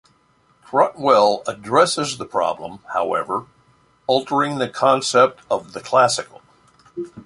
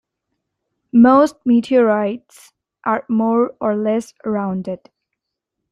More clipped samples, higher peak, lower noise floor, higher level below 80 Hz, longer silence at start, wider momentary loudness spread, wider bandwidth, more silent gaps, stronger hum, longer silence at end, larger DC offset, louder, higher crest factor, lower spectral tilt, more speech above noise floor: neither; about the same, -2 dBFS vs -2 dBFS; second, -59 dBFS vs -79 dBFS; about the same, -62 dBFS vs -60 dBFS; second, 0.7 s vs 0.95 s; about the same, 13 LU vs 14 LU; about the same, 11.5 kHz vs 11 kHz; neither; neither; second, 0.05 s vs 0.95 s; neither; about the same, -19 LUFS vs -17 LUFS; about the same, 18 dB vs 16 dB; second, -3.5 dB/octave vs -7 dB/octave; second, 40 dB vs 63 dB